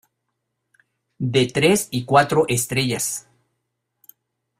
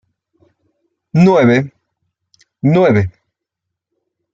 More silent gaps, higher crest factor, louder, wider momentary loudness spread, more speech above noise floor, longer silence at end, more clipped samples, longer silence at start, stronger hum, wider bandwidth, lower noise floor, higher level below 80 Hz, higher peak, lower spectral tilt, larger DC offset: neither; first, 22 dB vs 16 dB; second, -19 LUFS vs -13 LUFS; second, 8 LU vs 11 LU; second, 58 dB vs 69 dB; first, 1.4 s vs 1.25 s; neither; about the same, 1.2 s vs 1.15 s; neither; first, 16 kHz vs 7.6 kHz; about the same, -77 dBFS vs -79 dBFS; about the same, -56 dBFS vs -54 dBFS; about the same, -2 dBFS vs -2 dBFS; second, -4 dB/octave vs -8.5 dB/octave; neither